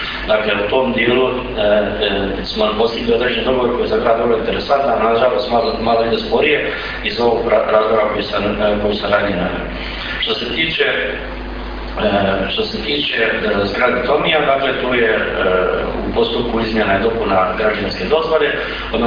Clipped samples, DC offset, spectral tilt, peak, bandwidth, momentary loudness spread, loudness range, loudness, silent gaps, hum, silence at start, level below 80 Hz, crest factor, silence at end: under 0.1%; under 0.1%; -6.5 dB/octave; 0 dBFS; 5.2 kHz; 6 LU; 2 LU; -16 LUFS; none; none; 0 s; -32 dBFS; 16 dB; 0 s